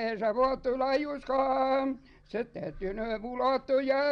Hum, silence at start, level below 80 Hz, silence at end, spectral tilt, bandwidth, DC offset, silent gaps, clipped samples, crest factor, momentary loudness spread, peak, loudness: none; 0 s; -52 dBFS; 0 s; -6.5 dB/octave; 6.4 kHz; under 0.1%; none; under 0.1%; 14 dB; 10 LU; -16 dBFS; -30 LUFS